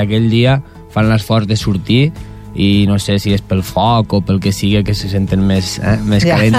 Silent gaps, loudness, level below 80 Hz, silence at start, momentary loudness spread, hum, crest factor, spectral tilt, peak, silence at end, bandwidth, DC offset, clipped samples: none; -14 LUFS; -32 dBFS; 0 s; 5 LU; none; 10 dB; -6.5 dB/octave; -2 dBFS; 0 s; 15.5 kHz; under 0.1%; under 0.1%